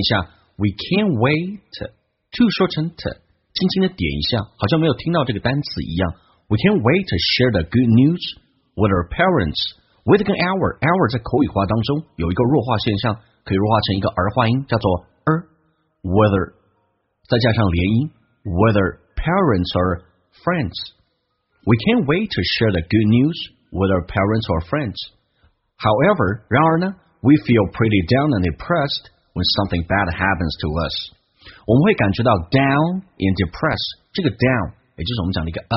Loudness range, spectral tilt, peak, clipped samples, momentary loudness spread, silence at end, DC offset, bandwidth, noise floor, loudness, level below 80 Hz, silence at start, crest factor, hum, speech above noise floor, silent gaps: 3 LU; -5 dB/octave; 0 dBFS; under 0.1%; 11 LU; 0 s; under 0.1%; 6 kHz; -69 dBFS; -19 LUFS; -38 dBFS; 0 s; 18 dB; none; 51 dB; none